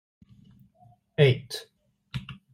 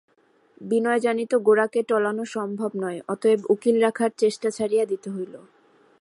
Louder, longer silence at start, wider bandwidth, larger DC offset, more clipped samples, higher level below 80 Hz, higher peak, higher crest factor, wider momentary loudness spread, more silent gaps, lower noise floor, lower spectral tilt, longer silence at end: second, -26 LUFS vs -23 LUFS; first, 1.2 s vs 0.6 s; first, 15.5 kHz vs 11.5 kHz; neither; neither; first, -60 dBFS vs -76 dBFS; about the same, -8 dBFS vs -8 dBFS; first, 22 dB vs 16 dB; first, 17 LU vs 10 LU; neither; about the same, -60 dBFS vs -58 dBFS; about the same, -6.5 dB/octave vs -5.5 dB/octave; second, 0.2 s vs 0.65 s